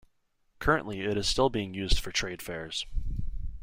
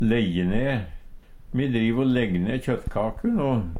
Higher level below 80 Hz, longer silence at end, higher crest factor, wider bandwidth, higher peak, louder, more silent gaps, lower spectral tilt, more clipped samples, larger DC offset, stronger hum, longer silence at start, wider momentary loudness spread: about the same, -36 dBFS vs -38 dBFS; about the same, 0 s vs 0 s; first, 20 dB vs 14 dB; first, 16.5 kHz vs 11 kHz; about the same, -10 dBFS vs -10 dBFS; second, -30 LUFS vs -25 LUFS; neither; second, -4 dB/octave vs -8 dB/octave; neither; neither; neither; first, 0.6 s vs 0 s; first, 11 LU vs 6 LU